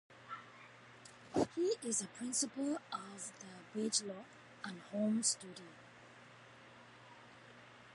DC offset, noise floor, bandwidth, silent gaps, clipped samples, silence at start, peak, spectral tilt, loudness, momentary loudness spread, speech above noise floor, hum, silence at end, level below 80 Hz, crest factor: under 0.1%; -59 dBFS; 11.5 kHz; none; under 0.1%; 0.1 s; -20 dBFS; -3 dB/octave; -39 LUFS; 22 LU; 19 dB; none; 0 s; -78 dBFS; 22 dB